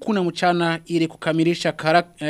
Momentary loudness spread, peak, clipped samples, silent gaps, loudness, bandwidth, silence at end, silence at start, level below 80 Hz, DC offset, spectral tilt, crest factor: 3 LU; -2 dBFS; under 0.1%; none; -21 LUFS; 12.5 kHz; 0 s; 0 s; -60 dBFS; under 0.1%; -5.5 dB/octave; 20 dB